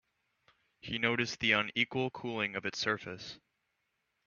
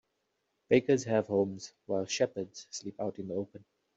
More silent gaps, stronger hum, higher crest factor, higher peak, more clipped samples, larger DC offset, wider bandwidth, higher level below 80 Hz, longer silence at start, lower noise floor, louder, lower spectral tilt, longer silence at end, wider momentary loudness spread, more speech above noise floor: neither; neither; about the same, 24 dB vs 22 dB; about the same, -12 dBFS vs -12 dBFS; neither; neither; second, 7.2 kHz vs 8 kHz; about the same, -70 dBFS vs -74 dBFS; first, 0.85 s vs 0.7 s; about the same, -82 dBFS vs -80 dBFS; about the same, -32 LUFS vs -32 LUFS; second, -2 dB/octave vs -5 dB/octave; first, 0.9 s vs 0.4 s; first, 17 LU vs 14 LU; about the same, 47 dB vs 49 dB